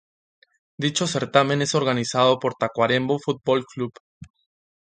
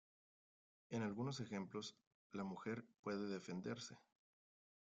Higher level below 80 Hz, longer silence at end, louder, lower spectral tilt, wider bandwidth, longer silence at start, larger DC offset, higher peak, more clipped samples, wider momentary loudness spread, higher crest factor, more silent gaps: first, -62 dBFS vs -84 dBFS; second, 0.65 s vs 1 s; first, -22 LUFS vs -49 LUFS; about the same, -4.5 dB/octave vs -5.5 dB/octave; about the same, 9.6 kHz vs 9 kHz; about the same, 0.8 s vs 0.9 s; neither; first, -2 dBFS vs -34 dBFS; neither; about the same, 7 LU vs 9 LU; first, 22 dB vs 16 dB; second, 4.00-4.21 s vs 2.07-2.30 s, 2.99-3.03 s